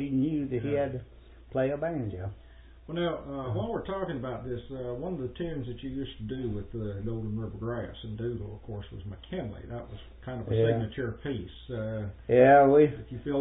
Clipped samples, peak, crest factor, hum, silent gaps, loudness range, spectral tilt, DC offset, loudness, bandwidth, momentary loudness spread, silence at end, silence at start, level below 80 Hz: under 0.1%; -8 dBFS; 22 dB; none; none; 11 LU; -11.5 dB/octave; under 0.1%; -30 LUFS; 4 kHz; 16 LU; 0 s; 0 s; -50 dBFS